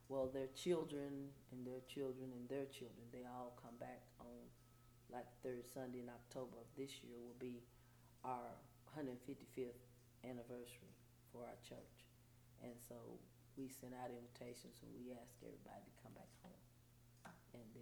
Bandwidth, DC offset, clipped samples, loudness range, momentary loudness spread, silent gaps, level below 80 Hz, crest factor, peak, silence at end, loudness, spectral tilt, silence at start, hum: over 20 kHz; under 0.1%; under 0.1%; 8 LU; 15 LU; none; -76 dBFS; 24 dB; -30 dBFS; 0 s; -53 LUFS; -5.5 dB/octave; 0 s; none